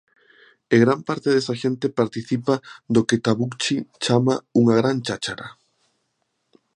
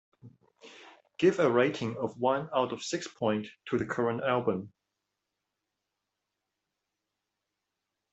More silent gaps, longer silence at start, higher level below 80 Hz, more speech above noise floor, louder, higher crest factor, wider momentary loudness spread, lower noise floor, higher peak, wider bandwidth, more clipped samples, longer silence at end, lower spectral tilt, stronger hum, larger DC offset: neither; first, 0.7 s vs 0.25 s; first, -62 dBFS vs -72 dBFS; second, 52 dB vs 57 dB; first, -21 LUFS vs -30 LUFS; about the same, 20 dB vs 22 dB; about the same, 8 LU vs 10 LU; second, -73 dBFS vs -86 dBFS; first, -2 dBFS vs -12 dBFS; first, 10.5 kHz vs 8.2 kHz; neither; second, 1.25 s vs 3.45 s; about the same, -5.5 dB/octave vs -5.5 dB/octave; neither; neither